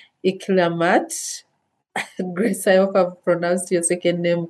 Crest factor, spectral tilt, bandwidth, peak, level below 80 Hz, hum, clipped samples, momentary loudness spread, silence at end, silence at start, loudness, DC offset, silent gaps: 16 dB; -4.5 dB/octave; 12.5 kHz; -4 dBFS; -76 dBFS; none; under 0.1%; 12 LU; 0 s; 0.25 s; -20 LUFS; under 0.1%; none